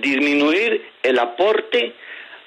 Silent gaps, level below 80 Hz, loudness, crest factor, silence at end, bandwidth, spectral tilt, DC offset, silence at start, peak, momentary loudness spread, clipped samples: none; -74 dBFS; -18 LUFS; 12 dB; 0.1 s; 10.5 kHz; -3.5 dB/octave; under 0.1%; 0 s; -6 dBFS; 10 LU; under 0.1%